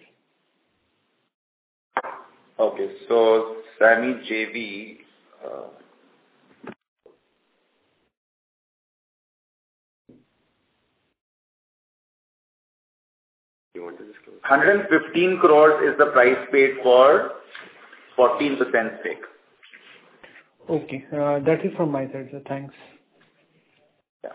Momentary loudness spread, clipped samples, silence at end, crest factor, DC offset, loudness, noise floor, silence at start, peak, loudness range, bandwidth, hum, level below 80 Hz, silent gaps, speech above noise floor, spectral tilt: 23 LU; under 0.1%; 0 s; 22 dB; under 0.1%; -20 LUFS; -71 dBFS; 1.95 s; -2 dBFS; 11 LU; 4 kHz; none; -74 dBFS; 6.88-6.96 s, 8.17-10.05 s, 11.20-13.71 s, 24.09-24.20 s; 52 dB; -9 dB/octave